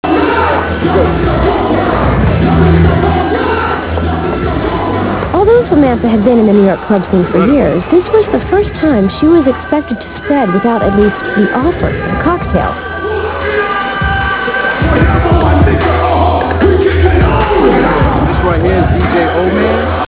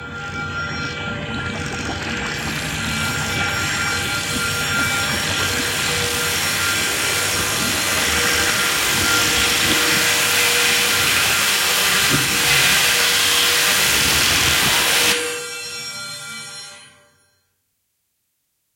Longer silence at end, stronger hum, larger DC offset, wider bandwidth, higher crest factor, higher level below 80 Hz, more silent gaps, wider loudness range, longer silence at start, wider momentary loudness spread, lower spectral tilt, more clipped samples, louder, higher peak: second, 0 s vs 1.9 s; neither; first, 0.4% vs under 0.1%; second, 4 kHz vs 16.5 kHz; second, 10 dB vs 18 dB; first, -20 dBFS vs -44 dBFS; neither; second, 3 LU vs 9 LU; about the same, 0.05 s vs 0 s; second, 6 LU vs 12 LU; first, -11 dB/octave vs -1 dB/octave; first, 0.3% vs under 0.1%; first, -11 LUFS vs -16 LUFS; about the same, 0 dBFS vs -2 dBFS